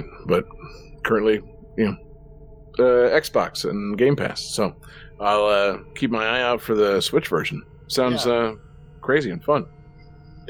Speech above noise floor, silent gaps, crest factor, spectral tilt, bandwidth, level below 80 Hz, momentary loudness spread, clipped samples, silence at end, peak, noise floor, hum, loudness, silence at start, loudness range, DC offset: 24 dB; none; 16 dB; -5 dB/octave; over 20 kHz; -48 dBFS; 14 LU; under 0.1%; 0 s; -6 dBFS; -45 dBFS; none; -22 LUFS; 0 s; 2 LU; under 0.1%